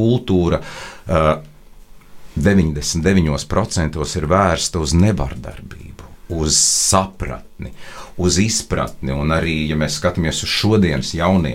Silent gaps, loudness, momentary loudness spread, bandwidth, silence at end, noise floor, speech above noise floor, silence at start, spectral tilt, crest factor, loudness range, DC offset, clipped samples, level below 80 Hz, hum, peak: none; -17 LUFS; 17 LU; 16.5 kHz; 0 s; -40 dBFS; 23 dB; 0 s; -4.5 dB/octave; 18 dB; 2 LU; under 0.1%; under 0.1%; -32 dBFS; none; 0 dBFS